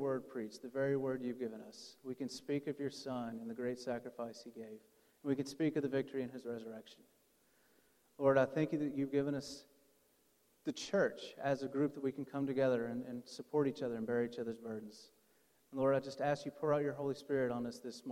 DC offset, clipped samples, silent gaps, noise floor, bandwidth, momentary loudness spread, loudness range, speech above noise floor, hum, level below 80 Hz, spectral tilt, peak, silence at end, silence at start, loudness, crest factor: under 0.1%; under 0.1%; none; -74 dBFS; 16.5 kHz; 14 LU; 5 LU; 36 dB; none; -78 dBFS; -6 dB/octave; -18 dBFS; 0 s; 0 s; -39 LUFS; 22 dB